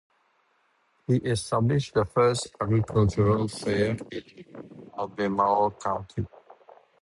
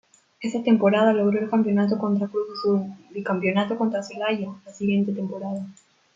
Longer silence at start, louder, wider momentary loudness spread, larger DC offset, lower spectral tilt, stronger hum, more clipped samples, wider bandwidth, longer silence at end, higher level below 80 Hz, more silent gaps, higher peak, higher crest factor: first, 1.1 s vs 0.4 s; second, -26 LUFS vs -23 LUFS; first, 18 LU vs 13 LU; neither; about the same, -6.5 dB/octave vs -7 dB/octave; neither; neither; first, 11.5 kHz vs 7.6 kHz; first, 0.75 s vs 0.45 s; first, -50 dBFS vs -70 dBFS; neither; second, -10 dBFS vs -6 dBFS; about the same, 18 dB vs 18 dB